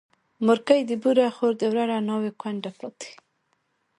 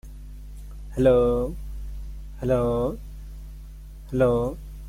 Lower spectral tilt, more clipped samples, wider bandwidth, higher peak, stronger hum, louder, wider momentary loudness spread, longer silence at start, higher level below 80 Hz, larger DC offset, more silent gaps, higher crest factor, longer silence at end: second, -5.5 dB/octave vs -8.5 dB/octave; neither; second, 11.5 kHz vs 15.5 kHz; first, -4 dBFS vs -8 dBFS; neither; about the same, -24 LUFS vs -24 LUFS; second, 17 LU vs 23 LU; first, 0.4 s vs 0.05 s; second, -74 dBFS vs -36 dBFS; neither; neither; about the same, 20 dB vs 18 dB; first, 0.85 s vs 0 s